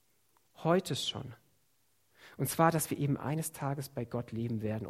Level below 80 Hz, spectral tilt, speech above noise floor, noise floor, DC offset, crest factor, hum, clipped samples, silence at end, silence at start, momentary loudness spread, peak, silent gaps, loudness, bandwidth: -68 dBFS; -5 dB/octave; 42 dB; -75 dBFS; under 0.1%; 24 dB; none; under 0.1%; 0 s; 0.6 s; 10 LU; -12 dBFS; none; -33 LUFS; 16 kHz